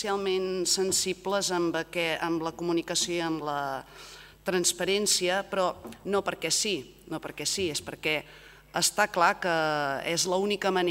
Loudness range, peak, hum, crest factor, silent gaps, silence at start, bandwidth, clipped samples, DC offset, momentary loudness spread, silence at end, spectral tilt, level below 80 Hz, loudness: 2 LU; -8 dBFS; none; 20 dB; none; 0 s; 16 kHz; under 0.1%; under 0.1%; 11 LU; 0 s; -2.5 dB/octave; -60 dBFS; -28 LUFS